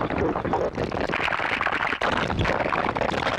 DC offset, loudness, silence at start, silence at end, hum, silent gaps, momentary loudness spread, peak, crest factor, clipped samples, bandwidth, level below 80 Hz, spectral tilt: under 0.1%; -24 LUFS; 0 s; 0 s; none; none; 2 LU; -8 dBFS; 16 dB; under 0.1%; 13.5 kHz; -42 dBFS; -5.5 dB/octave